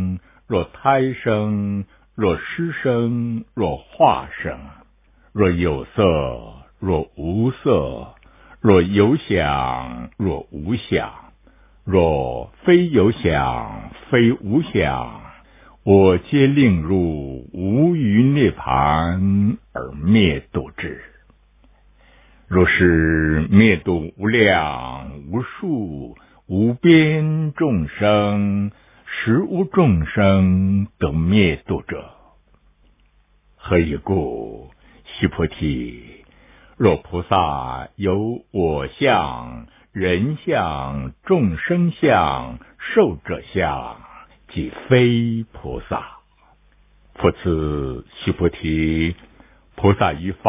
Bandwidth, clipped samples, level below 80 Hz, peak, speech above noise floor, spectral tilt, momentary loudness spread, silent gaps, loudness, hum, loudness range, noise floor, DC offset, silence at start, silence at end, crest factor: 3.8 kHz; under 0.1%; -36 dBFS; 0 dBFS; 39 dB; -11 dB/octave; 15 LU; none; -19 LUFS; none; 6 LU; -57 dBFS; under 0.1%; 0 s; 0 s; 20 dB